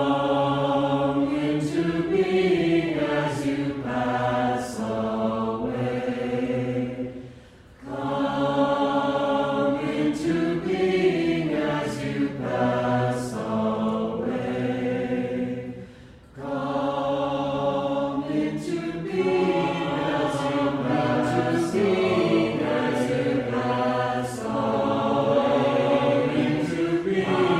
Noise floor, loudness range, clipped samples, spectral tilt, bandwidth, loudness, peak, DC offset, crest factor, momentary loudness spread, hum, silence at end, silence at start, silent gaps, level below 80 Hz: -48 dBFS; 5 LU; under 0.1%; -6.5 dB/octave; 13 kHz; -24 LUFS; -10 dBFS; under 0.1%; 14 dB; 7 LU; none; 0 s; 0 s; none; -54 dBFS